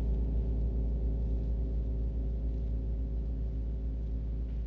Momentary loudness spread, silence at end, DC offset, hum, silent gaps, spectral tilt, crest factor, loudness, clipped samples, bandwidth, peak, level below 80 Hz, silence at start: 4 LU; 0 s; under 0.1%; 50 Hz at -55 dBFS; none; -11 dB/octave; 8 dB; -35 LUFS; under 0.1%; 1.7 kHz; -22 dBFS; -32 dBFS; 0 s